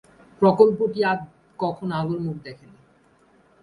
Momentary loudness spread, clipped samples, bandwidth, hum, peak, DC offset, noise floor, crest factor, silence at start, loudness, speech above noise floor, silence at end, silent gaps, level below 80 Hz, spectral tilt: 19 LU; under 0.1%; 10.5 kHz; none; -2 dBFS; under 0.1%; -58 dBFS; 22 dB; 0.4 s; -22 LUFS; 37 dB; 1.1 s; none; -60 dBFS; -8.5 dB/octave